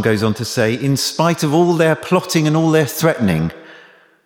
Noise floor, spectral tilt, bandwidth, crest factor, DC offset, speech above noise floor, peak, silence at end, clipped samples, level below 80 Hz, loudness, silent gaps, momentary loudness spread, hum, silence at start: -46 dBFS; -5.5 dB/octave; 19.5 kHz; 14 dB; under 0.1%; 30 dB; -2 dBFS; 0.5 s; under 0.1%; -48 dBFS; -16 LUFS; none; 4 LU; none; 0 s